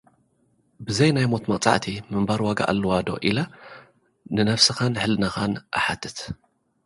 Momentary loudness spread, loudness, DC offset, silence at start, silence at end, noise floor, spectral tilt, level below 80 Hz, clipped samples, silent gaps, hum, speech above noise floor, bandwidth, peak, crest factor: 14 LU; -23 LUFS; under 0.1%; 0.8 s; 0.5 s; -65 dBFS; -4.5 dB/octave; -50 dBFS; under 0.1%; none; none; 43 dB; 11.5 kHz; -2 dBFS; 24 dB